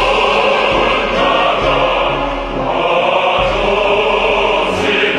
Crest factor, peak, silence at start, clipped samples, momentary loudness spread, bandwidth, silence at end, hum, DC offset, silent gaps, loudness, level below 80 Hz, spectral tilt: 14 dB; 0 dBFS; 0 s; under 0.1%; 4 LU; 10.5 kHz; 0 s; none; under 0.1%; none; -13 LUFS; -30 dBFS; -4.5 dB/octave